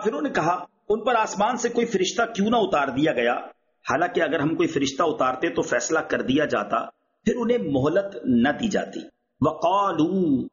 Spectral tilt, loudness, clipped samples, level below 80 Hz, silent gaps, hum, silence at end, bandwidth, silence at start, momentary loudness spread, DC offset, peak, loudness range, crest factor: -4 dB/octave; -23 LUFS; under 0.1%; -56 dBFS; none; none; 0.05 s; 7.2 kHz; 0 s; 6 LU; under 0.1%; -8 dBFS; 1 LU; 14 dB